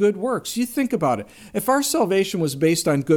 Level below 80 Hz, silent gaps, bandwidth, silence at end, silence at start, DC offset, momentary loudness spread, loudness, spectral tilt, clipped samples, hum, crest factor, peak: -58 dBFS; none; 18 kHz; 0 s; 0 s; under 0.1%; 6 LU; -21 LUFS; -5 dB/octave; under 0.1%; none; 14 dB; -6 dBFS